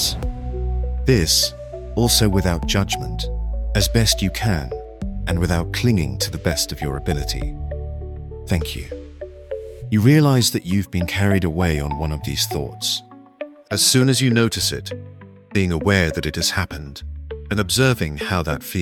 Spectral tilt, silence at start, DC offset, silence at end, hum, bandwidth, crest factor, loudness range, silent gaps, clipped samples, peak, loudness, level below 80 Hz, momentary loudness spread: -4.5 dB/octave; 0 s; under 0.1%; 0 s; none; 18 kHz; 20 dB; 4 LU; none; under 0.1%; 0 dBFS; -20 LUFS; -30 dBFS; 17 LU